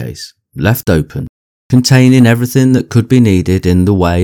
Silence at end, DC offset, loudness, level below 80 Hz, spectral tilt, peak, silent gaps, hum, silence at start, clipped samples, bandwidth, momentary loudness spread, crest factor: 0 s; under 0.1%; -10 LUFS; -32 dBFS; -6.5 dB/octave; 0 dBFS; 1.29-1.70 s; none; 0 s; 1%; 18.5 kHz; 17 LU; 10 dB